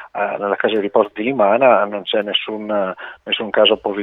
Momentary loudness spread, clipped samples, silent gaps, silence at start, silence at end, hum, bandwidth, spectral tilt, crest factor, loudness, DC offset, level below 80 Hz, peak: 9 LU; under 0.1%; none; 0 s; 0 s; none; 4 kHz; -7 dB/octave; 18 dB; -17 LUFS; under 0.1%; -62 dBFS; 0 dBFS